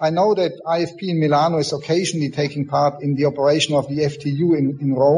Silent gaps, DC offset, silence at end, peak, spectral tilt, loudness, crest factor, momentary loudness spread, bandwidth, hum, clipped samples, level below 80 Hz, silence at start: none; under 0.1%; 0 s; -4 dBFS; -6 dB/octave; -19 LUFS; 14 dB; 5 LU; 10.5 kHz; none; under 0.1%; -58 dBFS; 0 s